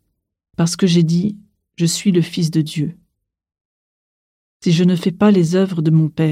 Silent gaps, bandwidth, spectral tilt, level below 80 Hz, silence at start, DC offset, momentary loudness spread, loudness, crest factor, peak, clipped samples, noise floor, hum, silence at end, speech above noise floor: 3.61-4.60 s; 14 kHz; -6 dB/octave; -58 dBFS; 0.6 s; under 0.1%; 10 LU; -16 LUFS; 14 dB; -4 dBFS; under 0.1%; -68 dBFS; none; 0 s; 53 dB